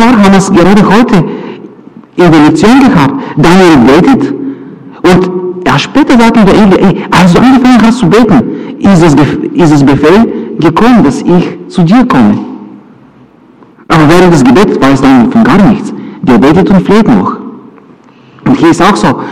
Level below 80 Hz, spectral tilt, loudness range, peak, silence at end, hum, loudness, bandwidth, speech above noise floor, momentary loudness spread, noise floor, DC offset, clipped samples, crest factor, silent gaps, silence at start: -30 dBFS; -6.5 dB/octave; 3 LU; 0 dBFS; 0 s; none; -5 LUFS; 14 kHz; 34 dB; 10 LU; -37 dBFS; under 0.1%; 4%; 4 dB; none; 0 s